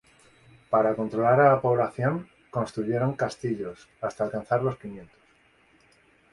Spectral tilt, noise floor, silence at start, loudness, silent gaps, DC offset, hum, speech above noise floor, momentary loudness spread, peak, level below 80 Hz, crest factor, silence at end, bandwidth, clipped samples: -8 dB/octave; -62 dBFS; 0.7 s; -26 LUFS; none; under 0.1%; none; 36 dB; 15 LU; -6 dBFS; -62 dBFS; 20 dB; 1.3 s; 11.5 kHz; under 0.1%